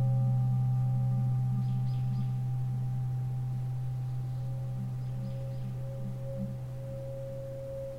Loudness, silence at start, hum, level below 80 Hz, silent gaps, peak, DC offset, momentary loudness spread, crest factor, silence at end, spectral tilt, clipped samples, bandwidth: -33 LUFS; 0 s; none; -52 dBFS; none; -20 dBFS; under 0.1%; 11 LU; 10 dB; 0 s; -10 dB/octave; under 0.1%; 5 kHz